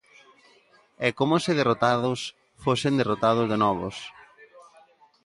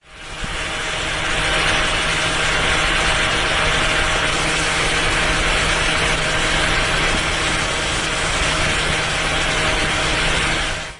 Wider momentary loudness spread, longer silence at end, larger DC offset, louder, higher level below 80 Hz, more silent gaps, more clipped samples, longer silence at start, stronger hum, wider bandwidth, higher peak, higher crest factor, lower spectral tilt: first, 12 LU vs 4 LU; first, 0.65 s vs 0 s; neither; second, -24 LUFS vs -17 LUFS; second, -60 dBFS vs -28 dBFS; neither; neither; first, 1 s vs 0.1 s; neither; about the same, 11.5 kHz vs 11 kHz; about the same, -6 dBFS vs -4 dBFS; first, 20 dB vs 14 dB; first, -5.5 dB/octave vs -2.5 dB/octave